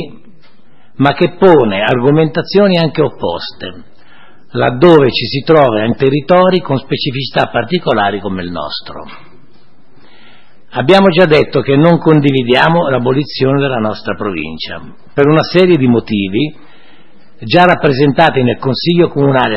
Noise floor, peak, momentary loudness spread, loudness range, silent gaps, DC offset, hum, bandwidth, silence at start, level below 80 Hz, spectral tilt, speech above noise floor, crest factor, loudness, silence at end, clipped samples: -49 dBFS; 0 dBFS; 14 LU; 6 LU; none; 3%; none; 8.4 kHz; 0 s; -42 dBFS; -8 dB/octave; 38 dB; 12 dB; -11 LUFS; 0 s; 0.2%